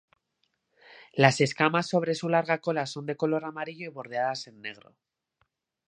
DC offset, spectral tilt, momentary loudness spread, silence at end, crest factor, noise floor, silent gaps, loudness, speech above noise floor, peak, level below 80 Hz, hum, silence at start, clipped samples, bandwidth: under 0.1%; -5.5 dB/octave; 15 LU; 1.15 s; 28 dB; -77 dBFS; none; -27 LUFS; 49 dB; -2 dBFS; -76 dBFS; none; 0.9 s; under 0.1%; 10.5 kHz